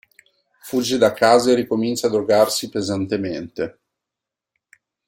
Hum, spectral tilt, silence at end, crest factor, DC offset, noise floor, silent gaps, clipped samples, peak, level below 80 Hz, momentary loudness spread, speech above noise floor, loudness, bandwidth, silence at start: none; -4 dB/octave; 1.4 s; 18 dB; under 0.1%; -86 dBFS; none; under 0.1%; -2 dBFS; -60 dBFS; 13 LU; 67 dB; -19 LUFS; 16.5 kHz; 0.65 s